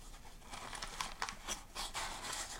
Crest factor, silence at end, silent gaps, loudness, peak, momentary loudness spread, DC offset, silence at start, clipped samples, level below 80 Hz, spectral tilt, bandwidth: 26 dB; 0 s; none; -43 LUFS; -20 dBFS; 10 LU; under 0.1%; 0 s; under 0.1%; -54 dBFS; -0.5 dB/octave; 16.5 kHz